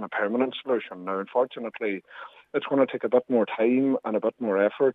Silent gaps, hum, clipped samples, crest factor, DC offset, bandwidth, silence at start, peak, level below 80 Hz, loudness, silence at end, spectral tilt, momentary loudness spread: none; none; under 0.1%; 16 dB; under 0.1%; 4 kHz; 0 s; -10 dBFS; -82 dBFS; -26 LUFS; 0 s; -8.5 dB/octave; 9 LU